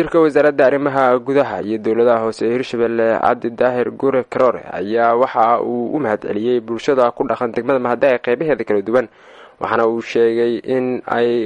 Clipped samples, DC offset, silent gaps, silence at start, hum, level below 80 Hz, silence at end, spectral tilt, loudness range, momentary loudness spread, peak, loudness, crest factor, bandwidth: under 0.1%; under 0.1%; none; 0 s; none; -56 dBFS; 0 s; -6.5 dB/octave; 2 LU; 5 LU; -2 dBFS; -17 LUFS; 16 dB; 9.8 kHz